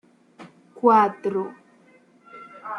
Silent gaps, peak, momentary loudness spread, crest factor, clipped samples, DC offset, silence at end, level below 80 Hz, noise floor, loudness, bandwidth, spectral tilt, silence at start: none; -4 dBFS; 25 LU; 20 dB; under 0.1%; under 0.1%; 0 s; -78 dBFS; -56 dBFS; -21 LUFS; 10.5 kHz; -7.5 dB/octave; 0.4 s